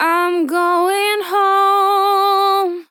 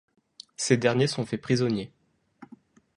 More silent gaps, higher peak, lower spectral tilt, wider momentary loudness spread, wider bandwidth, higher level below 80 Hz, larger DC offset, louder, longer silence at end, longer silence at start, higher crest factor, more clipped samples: neither; about the same, -4 dBFS vs -6 dBFS; second, -0.5 dB/octave vs -5 dB/octave; second, 4 LU vs 14 LU; first, 18.5 kHz vs 11.5 kHz; second, under -90 dBFS vs -64 dBFS; neither; first, -15 LUFS vs -26 LUFS; second, 0.1 s vs 0.5 s; second, 0 s vs 0.6 s; second, 12 dB vs 22 dB; neither